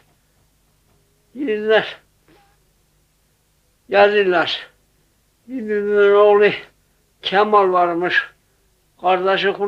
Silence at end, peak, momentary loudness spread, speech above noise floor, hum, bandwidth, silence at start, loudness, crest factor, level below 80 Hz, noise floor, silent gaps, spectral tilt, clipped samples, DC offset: 0 s; -2 dBFS; 15 LU; 46 dB; 50 Hz at -60 dBFS; 6.8 kHz; 1.35 s; -16 LUFS; 16 dB; -62 dBFS; -61 dBFS; none; -5.5 dB/octave; under 0.1%; under 0.1%